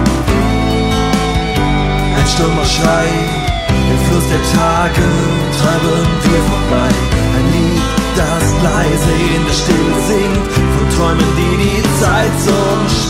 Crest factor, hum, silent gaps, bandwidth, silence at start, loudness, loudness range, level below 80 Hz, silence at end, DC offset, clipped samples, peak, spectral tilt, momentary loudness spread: 10 dB; none; none; 16.5 kHz; 0 s; -13 LUFS; 1 LU; -20 dBFS; 0 s; under 0.1%; under 0.1%; -2 dBFS; -5 dB/octave; 2 LU